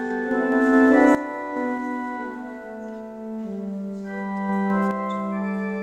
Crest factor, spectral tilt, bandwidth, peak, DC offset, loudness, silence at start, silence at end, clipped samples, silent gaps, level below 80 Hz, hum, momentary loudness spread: 18 dB; -7.5 dB/octave; 9.2 kHz; -4 dBFS; under 0.1%; -23 LUFS; 0 s; 0 s; under 0.1%; none; -60 dBFS; none; 18 LU